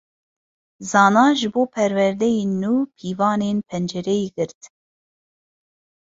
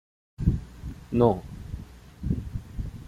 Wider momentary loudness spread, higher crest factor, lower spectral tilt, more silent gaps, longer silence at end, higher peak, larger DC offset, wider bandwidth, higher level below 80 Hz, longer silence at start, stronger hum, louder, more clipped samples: second, 11 LU vs 19 LU; about the same, 18 dB vs 22 dB; second, -5.5 dB/octave vs -9.5 dB/octave; first, 4.55-4.61 s vs none; first, 1.45 s vs 0 s; first, -2 dBFS vs -6 dBFS; neither; second, 7.8 kHz vs 14 kHz; second, -62 dBFS vs -38 dBFS; first, 0.8 s vs 0.4 s; neither; first, -20 LUFS vs -28 LUFS; neither